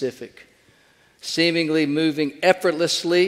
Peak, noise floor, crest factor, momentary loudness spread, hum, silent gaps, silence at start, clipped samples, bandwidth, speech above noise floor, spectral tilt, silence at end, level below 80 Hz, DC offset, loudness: 0 dBFS; -57 dBFS; 22 dB; 15 LU; none; none; 0 s; under 0.1%; 15.5 kHz; 36 dB; -4 dB/octave; 0 s; -70 dBFS; under 0.1%; -20 LUFS